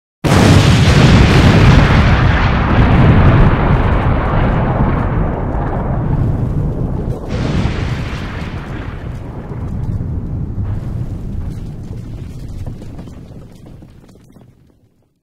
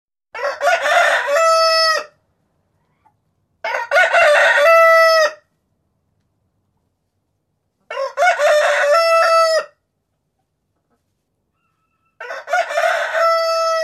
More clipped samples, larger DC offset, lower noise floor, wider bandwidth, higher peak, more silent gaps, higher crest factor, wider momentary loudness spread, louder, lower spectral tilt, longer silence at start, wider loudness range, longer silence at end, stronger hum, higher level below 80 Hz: neither; first, 0.1% vs under 0.1%; second, -54 dBFS vs -71 dBFS; about the same, 13 kHz vs 14 kHz; about the same, 0 dBFS vs -2 dBFS; neither; about the same, 14 dB vs 14 dB; first, 19 LU vs 15 LU; about the same, -13 LUFS vs -14 LUFS; first, -6.5 dB/octave vs 1.5 dB/octave; about the same, 0.25 s vs 0.35 s; first, 18 LU vs 10 LU; first, 1.4 s vs 0 s; neither; first, -20 dBFS vs -68 dBFS